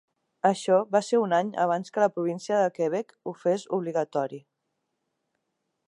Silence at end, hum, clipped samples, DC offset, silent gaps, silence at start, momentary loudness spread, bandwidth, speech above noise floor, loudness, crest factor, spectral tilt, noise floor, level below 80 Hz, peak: 1.5 s; none; under 0.1%; under 0.1%; none; 0.45 s; 8 LU; 11 kHz; 54 dB; -26 LUFS; 20 dB; -5.5 dB/octave; -80 dBFS; -82 dBFS; -8 dBFS